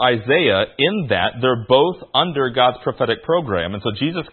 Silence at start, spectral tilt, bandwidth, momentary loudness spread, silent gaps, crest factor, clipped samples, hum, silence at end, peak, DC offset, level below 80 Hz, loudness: 0 s; -10.5 dB/octave; 4.4 kHz; 7 LU; none; 18 dB; under 0.1%; none; 0.05 s; 0 dBFS; under 0.1%; -52 dBFS; -18 LUFS